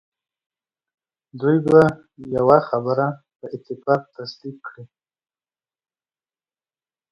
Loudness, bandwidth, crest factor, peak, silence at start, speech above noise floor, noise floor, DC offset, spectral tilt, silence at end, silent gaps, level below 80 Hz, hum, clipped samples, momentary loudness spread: -19 LUFS; 8 kHz; 22 dB; 0 dBFS; 1.35 s; over 71 dB; under -90 dBFS; under 0.1%; -8.5 dB/octave; 2.25 s; 3.36-3.40 s; -58 dBFS; none; under 0.1%; 21 LU